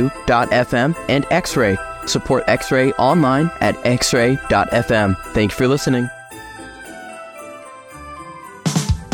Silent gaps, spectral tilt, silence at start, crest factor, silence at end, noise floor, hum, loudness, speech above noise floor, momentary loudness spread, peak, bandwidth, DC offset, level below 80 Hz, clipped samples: none; -5 dB/octave; 0 s; 16 dB; 0 s; -36 dBFS; none; -17 LUFS; 20 dB; 19 LU; -2 dBFS; 18.5 kHz; under 0.1%; -36 dBFS; under 0.1%